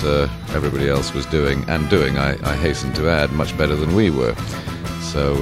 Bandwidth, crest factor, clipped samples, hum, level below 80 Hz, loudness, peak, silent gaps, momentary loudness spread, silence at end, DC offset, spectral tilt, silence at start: 16 kHz; 18 dB; under 0.1%; none; -30 dBFS; -20 LUFS; 0 dBFS; none; 7 LU; 0 s; under 0.1%; -6 dB/octave; 0 s